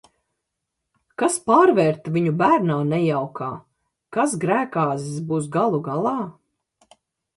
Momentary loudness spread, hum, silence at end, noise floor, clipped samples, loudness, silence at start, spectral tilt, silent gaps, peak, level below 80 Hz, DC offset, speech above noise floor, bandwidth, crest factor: 13 LU; none; 1.05 s; -80 dBFS; under 0.1%; -21 LUFS; 1.2 s; -6.5 dB/octave; none; -4 dBFS; -66 dBFS; under 0.1%; 60 dB; 11.5 kHz; 18 dB